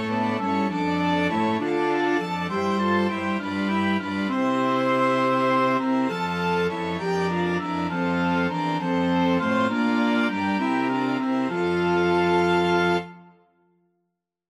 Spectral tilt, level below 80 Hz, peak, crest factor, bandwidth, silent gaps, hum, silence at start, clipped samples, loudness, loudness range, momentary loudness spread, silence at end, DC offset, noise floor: -6.5 dB/octave; -58 dBFS; -10 dBFS; 14 dB; 12 kHz; none; none; 0 s; under 0.1%; -23 LUFS; 2 LU; 5 LU; 1.25 s; under 0.1%; -78 dBFS